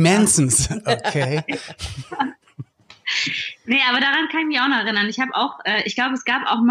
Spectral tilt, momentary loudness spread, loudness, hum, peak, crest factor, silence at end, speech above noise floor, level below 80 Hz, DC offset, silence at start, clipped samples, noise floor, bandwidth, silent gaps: -3 dB/octave; 13 LU; -19 LUFS; none; -4 dBFS; 16 dB; 0 s; 20 dB; -46 dBFS; under 0.1%; 0 s; under 0.1%; -40 dBFS; 15.5 kHz; none